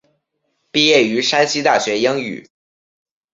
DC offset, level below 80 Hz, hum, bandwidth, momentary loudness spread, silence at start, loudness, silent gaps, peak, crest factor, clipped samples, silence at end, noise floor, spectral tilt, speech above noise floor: under 0.1%; -64 dBFS; none; 7.8 kHz; 11 LU; 0.75 s; -15 LUFS; none; 0 dBFS; 18 dB; under 0.1%; 0.95 s; -70 dBFS; -3 dB/octave; 54 dB